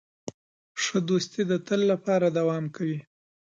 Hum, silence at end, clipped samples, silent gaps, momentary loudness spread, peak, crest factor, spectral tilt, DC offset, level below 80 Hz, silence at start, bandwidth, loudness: none; 0.4 s; under 0.1%; 0.34-0.75 s; 17 LU; -12 dBFS; 16 dB; -5.5 dB/octave; under 0.1%; -74 dBFS; 0.25 s; 9 kHz; -26 LUFS